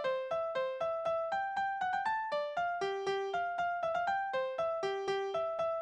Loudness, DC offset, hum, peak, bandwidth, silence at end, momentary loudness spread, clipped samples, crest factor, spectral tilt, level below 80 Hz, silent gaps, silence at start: -35 LUFS; under 0.1%; none; -22 dBFS; 9.4 kHz; 0 s; 2 LU; under 0.1%; 12 dB; -4 dB/octave; -74 dBFS; none; 0 s